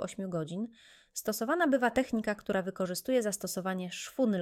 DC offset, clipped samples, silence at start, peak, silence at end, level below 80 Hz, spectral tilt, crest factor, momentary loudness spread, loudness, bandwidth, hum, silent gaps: under 0.1%; under 0.1%; 0 s; -14 dBFS; 0 s; -66 dBFS; -4.5 dB/octave; 18 dB; 10 LU; -32 LUFS; 17 kHz; none; none